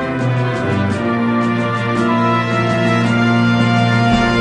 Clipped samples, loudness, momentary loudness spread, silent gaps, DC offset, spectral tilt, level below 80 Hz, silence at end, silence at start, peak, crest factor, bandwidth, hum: under 0.1%; -15 LUFS; 4 LU; none; under 0.1%; -7 dB/octave; -40 dBFS; 0 s; 0 s; -2 dBFS; 12 dB; 10.5 kHz; none